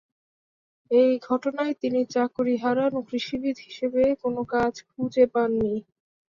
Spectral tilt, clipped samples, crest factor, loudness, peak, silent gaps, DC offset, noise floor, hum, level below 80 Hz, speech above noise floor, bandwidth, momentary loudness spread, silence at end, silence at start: -6 dB/octave; under 0.1%; 18 dB; -25 LUFS; -8 dBFS; none; under 0.1%; under -90 dBFS; none; -60 dBFS; over 66 dB; 7.2 kHz; 8 LU; 0.45 s; 0.9 s